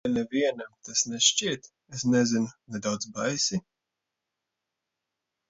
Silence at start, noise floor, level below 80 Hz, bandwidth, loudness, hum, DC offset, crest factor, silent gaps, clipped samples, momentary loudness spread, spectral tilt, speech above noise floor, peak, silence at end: 0.05 s; -86 dBFS; -66 dBFS; 8 kHz; -27 LUFS; none; under 0.1%; 24 dB; none; under 0.1%; 13 LU; -3 dB/octave; 58 dB; -6 dBFS; 1.9 s